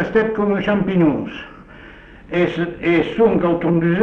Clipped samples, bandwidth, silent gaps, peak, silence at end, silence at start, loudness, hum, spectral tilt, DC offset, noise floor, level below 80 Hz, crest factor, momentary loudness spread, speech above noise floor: under 0.1%; 6.4 kHz; none; -4 dBFS; 0 s; 0 s; -18 LUFS; none; -9 dB/octave; under 0.1%; -40 dBFS; -44 dBFS; 14 dB; 10 LU; 24 dB